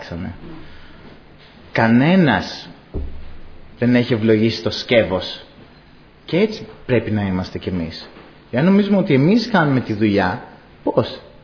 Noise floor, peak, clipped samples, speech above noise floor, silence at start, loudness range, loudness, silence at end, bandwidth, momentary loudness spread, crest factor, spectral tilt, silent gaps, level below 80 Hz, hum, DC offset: -46 dBFS; -2 dBFS; under 0.1%; 29 dB; 0 s; 4 LU; -18 LUFS; 0.15 s; 5.4 kHz; 17 LU; 18 dB; -7.5 dB/octave; none; -40 dBFS; none; under 0.1%